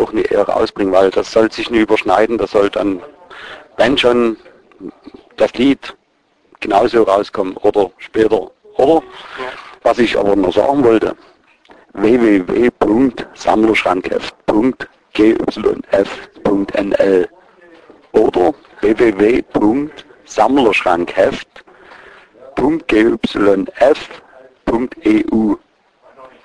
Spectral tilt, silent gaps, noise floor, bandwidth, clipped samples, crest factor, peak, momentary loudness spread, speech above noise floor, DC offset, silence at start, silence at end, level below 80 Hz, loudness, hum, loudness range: -6 dB/octave; none; -58 dBFS; 10.5 kHz; under 0.1%; 14 dB; 0 dBFS; 13 LU; 45 dB; under 0.1%; 0 s; 0.2 s; -44 dBFS; -14 LUFS; none; 3 LU